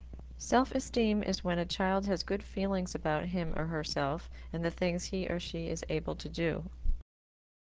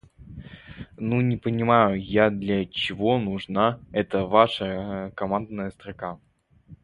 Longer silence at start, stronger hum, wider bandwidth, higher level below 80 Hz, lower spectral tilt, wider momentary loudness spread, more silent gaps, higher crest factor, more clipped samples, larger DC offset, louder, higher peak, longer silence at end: second, 0 s vs 0.2 s; neither; second, 8 kHz vs 10.5 kHz; first, -44 dBFS vs -52 dBFS; second, -5.5 dB/octave vs -8 dB/octave; second, 10 LU vs 23 LU; neither; about the same, 20 dB vs 22 dB; neither; neither; second, -34 LUFS vs -24 LUFS; second, -14 dBFS vs -4 dBFS; first, 0.65 s vs 0.1 s